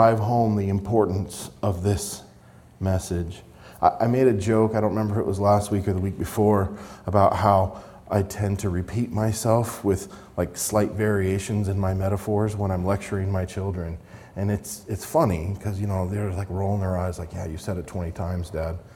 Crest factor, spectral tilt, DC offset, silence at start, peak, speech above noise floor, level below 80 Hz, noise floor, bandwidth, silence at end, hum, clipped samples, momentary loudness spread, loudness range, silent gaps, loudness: 20 dB; -7 dB/octave; under 0.1%; 0 s; -4 dBFS; 26 dB; -48 dBFS; -50 dBFS; 17 kHz; 0 s; none; under 0.1%; 11 LU; 5 LU; none; -25 LUFS